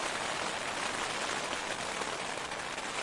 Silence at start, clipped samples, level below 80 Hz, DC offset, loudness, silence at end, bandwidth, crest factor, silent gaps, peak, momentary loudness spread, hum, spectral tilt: 0 s; under 0.1%; -64 dBFS; under 0.1%; -35 LUFS; 0 s; 11.5 kHz; 18 dB; none; -18 dBFS; 3 LU; none; -1.5 dB/octave